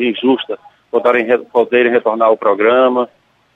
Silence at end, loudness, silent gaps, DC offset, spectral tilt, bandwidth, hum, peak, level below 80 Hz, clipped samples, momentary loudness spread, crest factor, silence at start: 0.5 s; -13 LUFS; none; under 0.1%; -6.5 dB/octave; 4.1 kHz; none; -2 dBFS; -64 dBFS; under 0.1%; 9 LU; 12 dB; 0 s